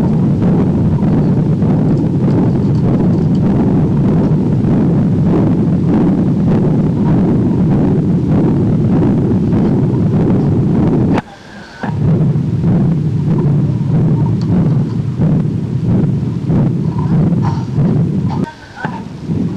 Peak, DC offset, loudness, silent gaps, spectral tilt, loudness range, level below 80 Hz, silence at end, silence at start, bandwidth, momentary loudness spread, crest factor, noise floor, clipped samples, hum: -8 dBFS; under 0.1%; -13 LUFS; none; -10.5 dB/octave; 2 LU; -32 dBFS; 0 s; 0 s; 7 kHz; 5 LU; 4 dB; -33 dBFS; under 0.1%; none